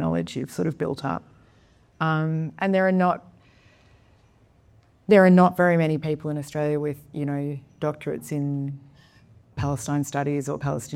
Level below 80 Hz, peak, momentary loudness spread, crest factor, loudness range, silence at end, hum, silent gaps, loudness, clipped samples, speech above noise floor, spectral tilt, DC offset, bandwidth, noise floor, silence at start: -56 dBFS; -4 dBFS; 14 LU; 20 dB; 8 LU; 0 s; none; none; -24 LUFS; under 0.1%; 35 dB; -7 dB/octave; under 0.1%; 15 kHz; -58 dBFS; 0 s